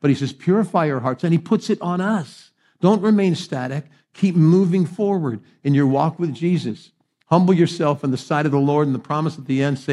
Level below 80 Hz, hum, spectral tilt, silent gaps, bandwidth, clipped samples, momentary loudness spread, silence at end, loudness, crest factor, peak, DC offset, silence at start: -70 dBFS; none; -7.5 dB/octave; none; 11.5 kHz; under 0.1%; 9 LU; 0 s; -19 LUFS; 18 dB; -2 dBFS; under 0.1%; 0.05 s